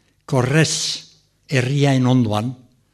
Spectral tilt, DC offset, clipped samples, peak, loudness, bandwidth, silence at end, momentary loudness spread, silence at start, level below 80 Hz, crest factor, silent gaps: -5 dB/octave; under 0.1%; under 0.1%; -2 dBFS; -19 LUFS; 13 kHz; 0.4 s; 8 LU; 0.3 s; -54 dBFS; 18 dB; none